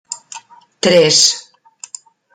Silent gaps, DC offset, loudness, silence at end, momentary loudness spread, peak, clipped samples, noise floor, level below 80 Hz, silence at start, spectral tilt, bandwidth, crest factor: none; under 0.1%; -11 LUFS; 0.95 s; 25 LU; 0 dBFS; under 0.1%; -40 dBFS; -62 dBFS; 0.1 s; -2 dB/octave; 16 kHz; 16 dB